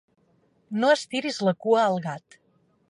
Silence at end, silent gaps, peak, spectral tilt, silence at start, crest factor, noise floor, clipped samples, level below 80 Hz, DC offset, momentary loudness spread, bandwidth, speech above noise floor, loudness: 0.75 s; none; -10 dBFS; -5 dB/octave; 0.7 s; 18 dB; -65 dBFS; under 0.1%; -76 dBFS; under 0.1%; 12 LU; 11.5 kHz; 41 dB; -24 LUFS